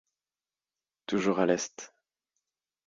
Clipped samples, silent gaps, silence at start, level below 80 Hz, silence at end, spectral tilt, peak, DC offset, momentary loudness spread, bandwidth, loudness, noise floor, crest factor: under 0.1%; none; 1.1 s; -72 dBFS; 1 s; -4.5 dB/octave; -12 dBFS; under 0.1%; 20 LU; 7.8 kHz; -29 LUFS; under -90 dBFS; 22 dB